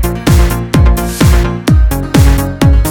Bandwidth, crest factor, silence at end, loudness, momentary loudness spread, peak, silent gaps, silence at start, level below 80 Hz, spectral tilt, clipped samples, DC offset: 18.5 kHz; 8 dB; 0 s; -10 LUFS; 2 LU; 0 dBFS; none; 0 s; -12 dBFS; -6 dB/octave; 0.7%; under 0.1%